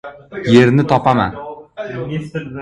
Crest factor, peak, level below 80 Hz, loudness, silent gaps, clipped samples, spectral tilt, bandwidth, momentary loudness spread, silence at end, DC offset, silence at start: 16 dB; 0 dBFS; -46 dBFS; -15 LUFS; none; under 0.1%; -7.5 dB/octave; 10.5 kHz; 20 LU; 0 s; under 0.1%; 0.05 s